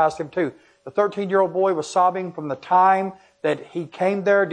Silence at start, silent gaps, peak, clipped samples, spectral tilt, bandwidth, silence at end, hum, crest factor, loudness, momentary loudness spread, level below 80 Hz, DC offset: 0 s; none; -6 dBFS; under 0.1%; -6 dB/octave; 10 kHz; 0 s; none; 16 dB; -21 LUFS; 12 LU; -68 dBFS; under 0.1%